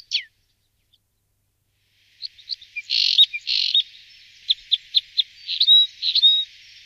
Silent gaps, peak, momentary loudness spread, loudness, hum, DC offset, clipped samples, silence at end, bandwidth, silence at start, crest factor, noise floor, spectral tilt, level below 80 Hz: none; -4 dBFS; 19 LU; -17 LUFS; none; under 0.1%; under 0.1%; 0.4 s; 14 kHz; 0.1 s; 18 dB; -70 dBFS; 4.5 dB/octave; -72 dBFS